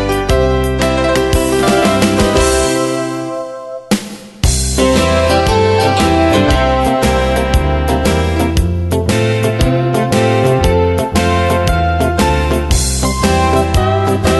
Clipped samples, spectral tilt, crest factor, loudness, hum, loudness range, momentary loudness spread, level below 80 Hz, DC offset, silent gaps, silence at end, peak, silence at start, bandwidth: under 0.1%; -5 dB/octave; 12 dB; -13 LUFS; none; 2 LU; 5 LU; -20 dBFS; under 0.1%; none; 0 s; 0 dBFS; 0 s; 12.5 kHz